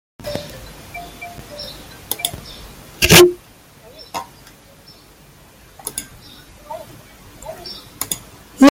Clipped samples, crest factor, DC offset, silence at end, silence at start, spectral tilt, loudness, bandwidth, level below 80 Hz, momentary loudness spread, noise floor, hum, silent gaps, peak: under 0.1%; 20 dB; under 0.1%; 0 s; 0.25 s; -3.5 dB/octave; -16 LUFS; 17 kHz; -42 dBFS; 28 LU; -46 dBFS; none; none; 0 dBFS